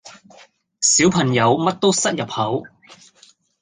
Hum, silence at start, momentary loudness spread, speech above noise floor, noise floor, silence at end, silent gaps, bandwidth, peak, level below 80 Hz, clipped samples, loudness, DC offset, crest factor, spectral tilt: none; 0.05 s; 9 LU; 36 dB; -54 dBFS; 0.95 s; none; 10 kHz; -2 dBFS; -56 dBFS; under 0.1%; -17 LUFS; under 0.1%; 18 dB; -3.5 dB/octave